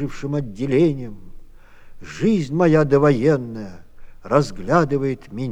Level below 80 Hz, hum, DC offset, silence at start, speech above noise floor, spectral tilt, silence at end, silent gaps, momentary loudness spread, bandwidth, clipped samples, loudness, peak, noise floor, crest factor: -42 dBFS; none; under 0.1%; 0 s; 22 dB; -8 dB/octave; 0 s; none; 16 LU; 9.8 kHz; under 0.1%; -19 LUFS; -2 dBFS; -41 dBFS; 18 dB